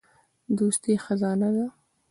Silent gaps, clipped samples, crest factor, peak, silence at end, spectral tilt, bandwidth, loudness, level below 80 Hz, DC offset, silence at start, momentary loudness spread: none; under 0.1%; 14 dB; -12 dBFS; 0.4 s; -6 dB/octave; 11.5 kHz; -26 LUFS; -68 dBFS; under 0.1%; 0.5 s; 6 LU